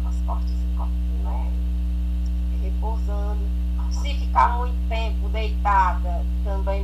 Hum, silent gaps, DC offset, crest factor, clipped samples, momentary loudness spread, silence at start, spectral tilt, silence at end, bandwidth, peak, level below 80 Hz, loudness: 60 Hz at -25 dBFS; none; under 0.1%; 16 dB; under 0.1%; 6 LU; 0 s; -7 dB/octave; 0 s; 7.6 kHz; -6 dBFS; -22 dBFS; -24 LUFS